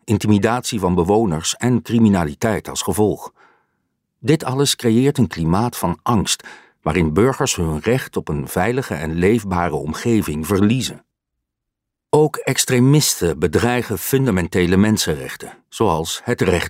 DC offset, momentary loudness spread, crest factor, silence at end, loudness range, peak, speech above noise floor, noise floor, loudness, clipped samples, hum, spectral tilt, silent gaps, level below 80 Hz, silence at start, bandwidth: under 0.1%; 7 LU; 16 dB; 0 s; 3 LU; -2 dBFS; 63 dB; -80 dBFS; -18 LUFS; under 0.1%; none; -5 dB/octave; none; -40 dBFS; 0.05 s; 16 kHz